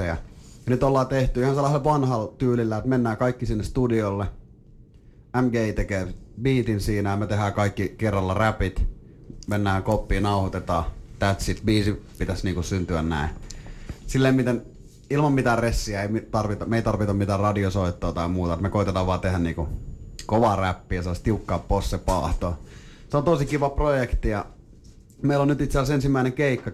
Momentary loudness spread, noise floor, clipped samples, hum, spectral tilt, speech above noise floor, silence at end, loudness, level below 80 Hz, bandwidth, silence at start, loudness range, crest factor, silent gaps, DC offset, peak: 9 LU; -50 dBFS; under 0.1%; none; -7 dB/octave; 27 dB; 0 s; -24 LUFS; -34 dBFS; 14 kHz; 0 s; 3 LU; 14 dB; none; under 0.1%; -10 dBFS